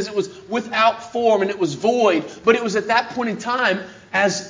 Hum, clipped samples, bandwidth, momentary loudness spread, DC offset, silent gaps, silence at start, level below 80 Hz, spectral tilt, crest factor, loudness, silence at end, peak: none; under 0.1%; 7.6 kHz; 7 LU; under 0.1%; none; 0 s; -62 dBFS; -4 dB/octave; 18 dB; -20 LUFS; 0 s; -2 dBFS